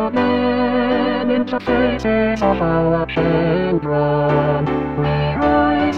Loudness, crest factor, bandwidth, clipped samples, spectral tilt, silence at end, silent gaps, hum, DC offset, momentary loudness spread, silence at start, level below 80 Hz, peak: -17 LUFS; 12 dB; 7 kHz; under 0.1%; -8 dB/octave; 0 s; none; none; 0.6%; 3 LU; 0 s; -36 dBFS; -4 dBFS